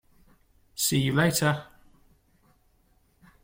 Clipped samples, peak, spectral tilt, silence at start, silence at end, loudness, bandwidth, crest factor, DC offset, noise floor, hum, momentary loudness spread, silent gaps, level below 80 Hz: under 0.1%; -8 dBFS; -4 dB/octave; 0.75 s; 1.8 s; -25 LUFS; 16.5 kHz; 22 dB; under 0.1%; -65 dBFS; none; 11 LU; none; -58 dBFS